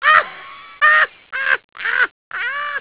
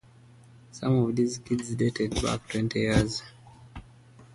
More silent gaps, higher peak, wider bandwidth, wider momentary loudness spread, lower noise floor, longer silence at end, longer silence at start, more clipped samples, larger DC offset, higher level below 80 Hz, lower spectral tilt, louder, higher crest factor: first, 1.64-1.69 s, 2.11-2.31 s vs none; first, 0 dBFS vs -8 dBFS; second, 4 kHz vs 11.5 kHz; second, 15 LU vs 23 LU; second, -37 dBFS vs -54 dBFS; about the same, 0 s vs 0.1 s; second, 0 s vs 0.75 s; neither; first, 0.2% vs under 0.1%; second, -62 dBFS vs -46 dBFS; second, -3 dB/octave vs -6 dB/octave; first, -16 LUFS vs -28 LUFS; about the same, 18 dB vs 20 dB